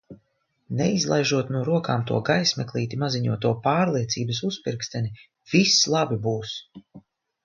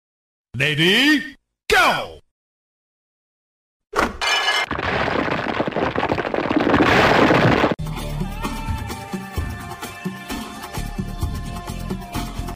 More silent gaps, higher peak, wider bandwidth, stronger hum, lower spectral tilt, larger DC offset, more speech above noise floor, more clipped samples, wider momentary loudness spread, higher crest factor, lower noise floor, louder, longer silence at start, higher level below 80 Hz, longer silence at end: second, none vs 2.31-3.80 s; about the same, -6 dBFS vs -4 dBFS; second, 7.4 kHz vs 16 kHz; neither; about the same, -4.5 dB/octave vs -4.5 dB/octave; neither; second, 47 dB vs over 73 dB; neither; second, 11 LU vs 16 LU; about the same, 20 dB vs 18 dB; second, -71 dBFS vs under -90 dBFS; second, -23 LUFS vs -20 LUFS; second, 0.1 s vs 0.55 s; second, -60 dBFS vs -36 dBFS; first, 0.45 s vs 0 s